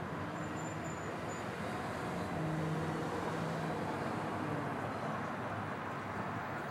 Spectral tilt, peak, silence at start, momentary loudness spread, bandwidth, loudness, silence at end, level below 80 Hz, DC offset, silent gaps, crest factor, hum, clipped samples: -6 dB/octave; -24 dBFS; 0 s; 4 LU; 16 kHz; -39 LUFS; 0 s; -64 dBFS; under 0.1%; none; 14 dB; none; under 0.1%